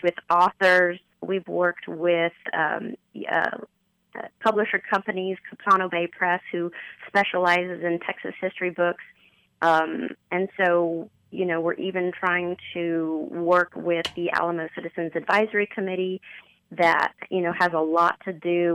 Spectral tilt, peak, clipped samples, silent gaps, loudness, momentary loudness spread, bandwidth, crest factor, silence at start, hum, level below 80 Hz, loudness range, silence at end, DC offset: -6 dB/octave; -8 dBFS; under 0.1%; none; -24 LUFS; 11 LU; 12 kHz; 16 dB; 0.05 s; none; -70 dBFS; 2 LU; 0 s; under 0.1%